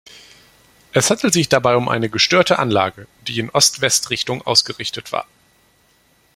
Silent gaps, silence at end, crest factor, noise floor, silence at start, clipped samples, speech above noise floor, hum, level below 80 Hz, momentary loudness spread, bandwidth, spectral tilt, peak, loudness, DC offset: none; 1.1 s; 20 dB; -57 dBFS; 0.15 s; under 0.1%; 40 dB; none; -54 dBFS; 12 LU; 16.5 kHz; -3 dB/octave; 0 dBFS; -16 LUFS; under 0.1%